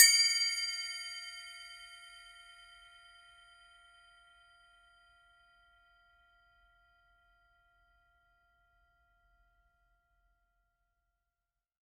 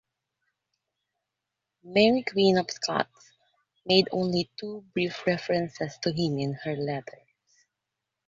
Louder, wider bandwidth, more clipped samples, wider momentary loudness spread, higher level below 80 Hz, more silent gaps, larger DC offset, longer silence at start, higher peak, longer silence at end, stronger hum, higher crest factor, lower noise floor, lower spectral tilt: second, -30 LUFS vs -27 LUFS; first, 15 kHz vs 7.8 kHz; neither; first, 29 LU vs 12 LU; second, -76 dBFS vs -66 dBFS; neither; neither; second, 0 s vs 1.85 s; about the same, -6 dBFS vs -6 dBFS; first, 10 s vs 1.2 s; neither; first, 32 dB vs 24 dB; first, under -90 dBFS vs -86 dBFS; second, 6.5 dB/octave vs -5.5 dB/octave